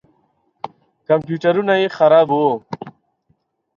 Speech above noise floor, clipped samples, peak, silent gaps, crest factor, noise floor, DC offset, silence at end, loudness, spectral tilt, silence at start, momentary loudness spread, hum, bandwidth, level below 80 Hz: 50 dB; under 0.1%; -2 dBFS; none; 18 dB; -64 dBFS; under 0.1%; 0.85 s; -16 LUFS; -7.5 dB/octave; 0.65 s; 22 LU; none; 7 kHz; -66 dBFS